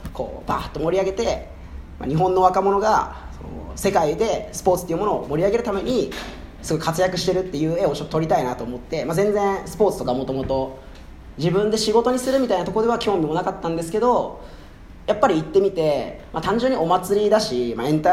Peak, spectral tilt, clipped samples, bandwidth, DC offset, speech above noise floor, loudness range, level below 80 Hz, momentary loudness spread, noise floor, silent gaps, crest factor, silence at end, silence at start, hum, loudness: -2 dBFS; -5.5 dB/octave; under 0.1%; 16 kHz; under 0.1%; 20 dB; 2 LU; -42 dBFS; 13 LU; -41 dBFS; none; 20 dB; 0 s; 0 s; none; -21 LUFS